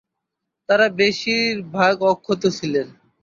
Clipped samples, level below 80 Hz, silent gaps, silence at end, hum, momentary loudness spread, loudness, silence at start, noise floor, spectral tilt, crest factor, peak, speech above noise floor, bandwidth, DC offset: under 0.1%; -64 dBFS; none; 0.3 s; none; 7 LU; -19 LUFS; 0.7 s; -80 dBFS; -4.5 dB/octave; 18 dB; -4 dBFS; 62 dB; 7.6 kHz; under 0.1%